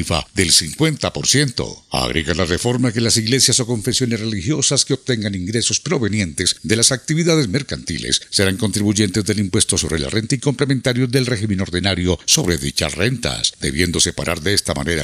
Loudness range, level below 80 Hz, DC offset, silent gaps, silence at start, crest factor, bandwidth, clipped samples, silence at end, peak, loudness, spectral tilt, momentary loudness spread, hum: 1 LU; -40 dBFS; under 0.1%; none; 0 s; 18 dB; 15.5 kHz; under 0.1%; 0 s; 0 dBFS; -17 LUFS; -3.5 dB/octave; 7 LU; none